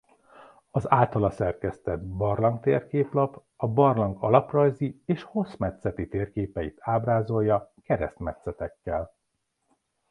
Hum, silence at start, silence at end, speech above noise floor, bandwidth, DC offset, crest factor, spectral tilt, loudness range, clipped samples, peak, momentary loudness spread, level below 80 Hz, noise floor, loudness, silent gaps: none; 0.4 s; 1.05 s; 52 dB; 10.5 kHz; under 0.1%; 22 dB; -9.5 dB/octave; 4 LU; under 0.1%; -4 dBFS; 11 LU; -48 dBFS; -78 dBFS; -27 LUFS; none